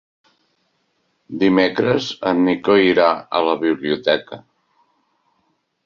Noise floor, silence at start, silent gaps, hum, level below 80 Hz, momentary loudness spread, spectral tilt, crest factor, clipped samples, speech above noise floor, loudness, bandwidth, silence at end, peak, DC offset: -67 dBFS; 1.3 s; none; none; -58 dBFS; 7 LU; -6 dB/octave; 18 dB; under 0.1%; 50 dB; -17 LUFS; 7.2 kHz; 1.5 s; -2 dBFS; under 0.1%